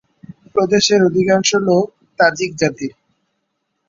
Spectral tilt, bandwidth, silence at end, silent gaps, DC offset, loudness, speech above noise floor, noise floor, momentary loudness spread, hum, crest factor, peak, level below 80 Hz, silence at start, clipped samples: -4 dB/octave; 7.8 kHz; 1 s; none; under 0.1%; -15 LUFS; 57 dB; -71 dBFS; 11 LU; none; 16 dB; 0 dBFS; -56 dBFS; 0.55 s; under 0.1%